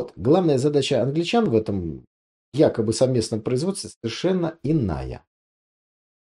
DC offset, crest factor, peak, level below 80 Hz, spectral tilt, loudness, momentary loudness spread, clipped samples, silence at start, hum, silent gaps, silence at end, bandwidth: under 0.1%; 18 dB; -6 dBFS; -48 dBFS; -6 dB/octave; -22 LUFS; 12 LU; under 0.1%; 0 s; none; 2.07-2.52 s, 3.96-4.01 s; 1.05 s; 12 kHz